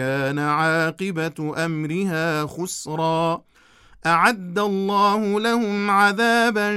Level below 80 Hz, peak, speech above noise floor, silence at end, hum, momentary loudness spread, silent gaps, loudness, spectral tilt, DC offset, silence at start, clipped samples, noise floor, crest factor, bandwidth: -62 dBFS; -4 dBFS; 31 dB; 0 s; none; 9 LU; none; -21 LUFS; -5 dB/octave; under 0.1%; 0 s; under 0.1%; -52 dBFS; 18 dB; 15.5 kHz